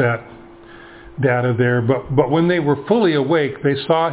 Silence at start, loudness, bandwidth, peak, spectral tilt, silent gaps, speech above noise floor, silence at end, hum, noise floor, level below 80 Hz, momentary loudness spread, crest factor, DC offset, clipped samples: 0 s; -17 LUFS; 4 kHz; 0 dBFS; -11 dB/octave; none; 24 dB; 0 s; none; -40 dBFS; -50 dBFS; 5 LU; 16 dB; under 0.1%; under 0.1%